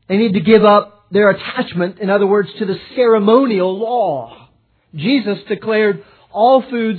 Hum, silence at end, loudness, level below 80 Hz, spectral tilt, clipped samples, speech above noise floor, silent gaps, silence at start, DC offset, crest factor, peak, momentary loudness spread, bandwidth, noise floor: none; 0 s; -14 LUFS; -58 dBFS; -10 dB/octave; under 0.1%; 38 dB; none; 0.1 s; under 0.1%; 14 dB; 0 dBFS; 11 LU; 4.6 kHz; -52 dBFS